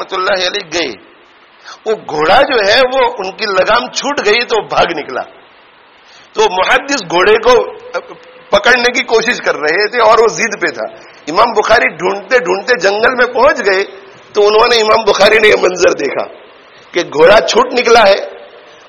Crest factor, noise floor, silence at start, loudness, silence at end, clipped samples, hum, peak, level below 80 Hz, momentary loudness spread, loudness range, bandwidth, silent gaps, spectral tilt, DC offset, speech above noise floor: 12 dB; -43 dBFS; 0 s; -10 LUFS; 0.3 s; 0.4%; none; 0 dBFS; -42 dBFS; 13 LU; 4 LU; 12 kHz; none; -2.5 dB/octave; under 0.1%; 32 dB